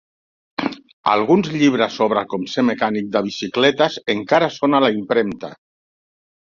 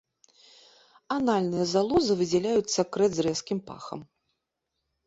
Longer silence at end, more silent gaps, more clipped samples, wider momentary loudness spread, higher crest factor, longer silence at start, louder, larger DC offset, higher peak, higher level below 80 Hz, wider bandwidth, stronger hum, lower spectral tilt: about the same, 0.95 s vs 1.05 s; first, 0.93-1.03 s vs none; neither; second, 10 LU vs 15 LU; about the same, 18 dB vs 18 dB; second, 0.6 s vs 1.1 s; first, -18 LUFS vs -26 LUFS; neither; first, -2 dBFS vs -10 dBFS; about the same, -60 dBFS vs -62 dBFS; about the same, 7.4 kHz vs 8 kHz; neither; about the same, -5.5 dB/octave vs -5 dB/octave